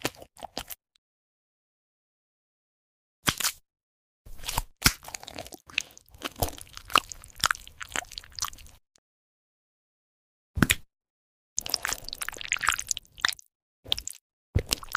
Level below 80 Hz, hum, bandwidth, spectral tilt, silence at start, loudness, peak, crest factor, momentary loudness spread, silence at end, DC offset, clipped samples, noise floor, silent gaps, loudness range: -46 dBFS; none; 16 kHz; -2 dB/octave; 0 s; -30 LUFS; -4 dBFS; 30 dB; 17 LU; 0 s; under 0.1%; under 0.1%; under -90 dBFS; 0.98-3.23 s, 3.83-4.25 s, 8.98-10.54 s, 11.10-11.56 s, 13.55-13.83 s, 14.21-14.53 s; 6 LU